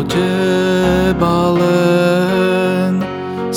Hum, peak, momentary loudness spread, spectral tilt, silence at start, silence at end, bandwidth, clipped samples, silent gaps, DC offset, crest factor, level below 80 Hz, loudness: none; 0 dBFS; 5 LU; -6.5 dB/octave; 0 s; 0 s; 16.5 kHz; under 0.1%; none; under 0.1%; 12 dB; -36 dBFS; -14 LUFS